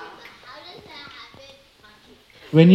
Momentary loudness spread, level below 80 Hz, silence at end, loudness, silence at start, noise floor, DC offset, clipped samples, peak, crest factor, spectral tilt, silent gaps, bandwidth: 25 LU; -62 dBFS; 0 s; -18 LUFS; 2.55 s; -52 dBFS; under 0.1%; under 0.1%; 0 dBFS; 20 dB; -9 dB/octave; none; 6.2 kHz